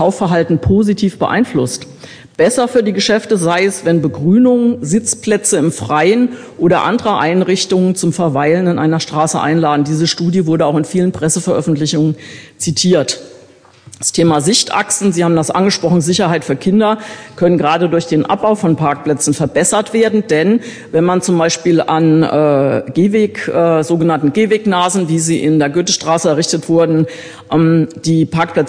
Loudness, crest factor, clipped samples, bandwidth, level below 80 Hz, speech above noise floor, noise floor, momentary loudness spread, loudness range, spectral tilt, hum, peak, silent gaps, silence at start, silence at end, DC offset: -13 LUFS; 12 dB; under 0.1%; 10.5 kHz; -46 dBFS; 30 dB; -43 dBFS; 4 LU; 2 LU; -5 dB/octave; none; 0 dBFS; none; 0 s; 0 s; under 0.1%